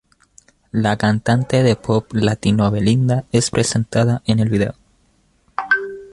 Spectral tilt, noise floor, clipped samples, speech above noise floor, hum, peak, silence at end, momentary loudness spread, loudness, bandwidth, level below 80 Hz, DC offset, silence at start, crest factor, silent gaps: -5.5 dB/octave; -59 dBFS; under 0.1%; 42 dB; none; -2 dBFS; 0.05 s; 5 LU; -18 LUFS; 11.5 kHz; -44 dBFS; under 0.1%; 0.75 s; 16 dB; none